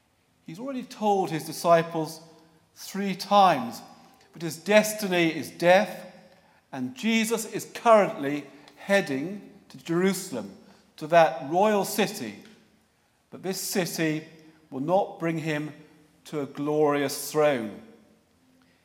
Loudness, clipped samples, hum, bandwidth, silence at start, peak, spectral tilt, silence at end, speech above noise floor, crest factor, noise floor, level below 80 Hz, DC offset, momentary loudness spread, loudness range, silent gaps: -25 LUFS; under 0.1%; none; 17 kHz; 0.5 s; -4 dBFS; -4.5 dB/octave; 1 s; 42 dB; 24 dB; -67 dBFS; -78 dBFS; under 0.1%; 18 LU; 5 LU; none